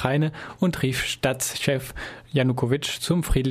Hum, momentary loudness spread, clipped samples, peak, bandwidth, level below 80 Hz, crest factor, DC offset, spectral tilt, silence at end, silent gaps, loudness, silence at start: none; 5 LU; under 0.1%; -4 dBFS; 15.5 kHz; -38 dBFS; 20 dB; under 0.1%; -5 dB/octave; 0 s; none; -24 LUFS; 0 s